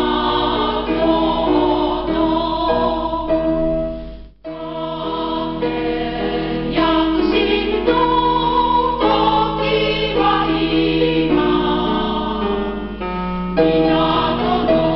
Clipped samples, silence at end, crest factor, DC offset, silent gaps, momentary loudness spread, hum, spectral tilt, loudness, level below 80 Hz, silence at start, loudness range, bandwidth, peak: under 0.1%; 0 s; 12 dB; 0.2%; none; 8 LU; none; -3.5 dB/octave; -17 LUFS; -34 dBFS; 0 s; 5 LU; 5.8 kHz; -4 dBFS